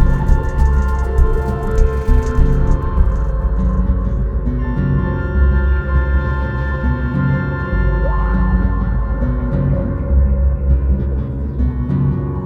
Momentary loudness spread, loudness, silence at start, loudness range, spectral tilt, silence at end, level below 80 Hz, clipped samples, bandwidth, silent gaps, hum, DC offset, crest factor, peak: 4 LU; -18 LUFS; 0 s; 1 LU; -9.5 dB/octave; 0 s; -16 dBFS; under 0.1%; 6.4 kHz; none; none; under 0.1%; 14 dB; 0 dBFS